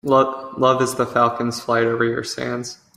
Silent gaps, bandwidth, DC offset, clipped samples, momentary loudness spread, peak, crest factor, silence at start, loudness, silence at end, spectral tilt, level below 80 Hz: none; 15.5 kHz; under 0.1%; under 0.1%; 8 LU; -2 dBFS; 18 dB; 0.05 s; -20 LUFS; 0.2 s; -5 dB/octave; -58 dBFS